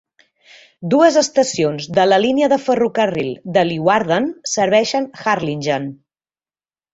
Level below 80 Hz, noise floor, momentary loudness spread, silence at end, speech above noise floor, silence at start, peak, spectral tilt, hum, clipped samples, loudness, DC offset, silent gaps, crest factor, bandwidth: -58 dBFS; under -90 dBFS; 7 LU; 1 s; over 74 dB; 0.8 s; -2 dBFS; -4.5 dB/octave; none; under 0.1%; -16 LUFS; under 0.1%; none; 16 dB; 8 kHz